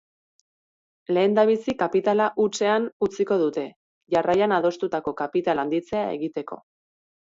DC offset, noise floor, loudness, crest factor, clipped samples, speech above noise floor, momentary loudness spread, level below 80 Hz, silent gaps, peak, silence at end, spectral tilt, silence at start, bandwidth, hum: under 0.1%; under -90 dBFS; -23 LUFS; 16 dB; under 0.1%; over 67 dB; 11 LU; -64 dBFS; 2.92-3.00 s, 3.76-4.01 s; -8 dBFS; 0.75 s; -5.5 dB/octave; 1.1 s; 7.8 kHz; none